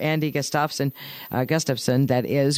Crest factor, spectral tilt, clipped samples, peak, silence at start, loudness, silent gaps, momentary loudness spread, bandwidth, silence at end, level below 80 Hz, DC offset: 16 dB; -5 dB/octave; under 0.1%; -6 dBFS; 0 s; -23 LUFS; none; 7 LU; 16 kHz; 0 s; -62 dBFS; under 0.1%